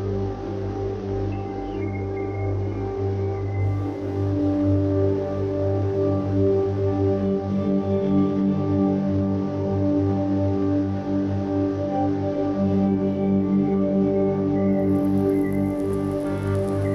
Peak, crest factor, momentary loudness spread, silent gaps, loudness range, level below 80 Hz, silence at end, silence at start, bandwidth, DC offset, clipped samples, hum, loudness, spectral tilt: -10 dBFS; 12 dB; 7 LU; none; 5 LU; -44 dBFS; 0 s; 0 s; 11.5 kHz; under 0.1%; under 0.1%; 50 Hz at -40 dBFS; -23 LUFS; -10 dB/octave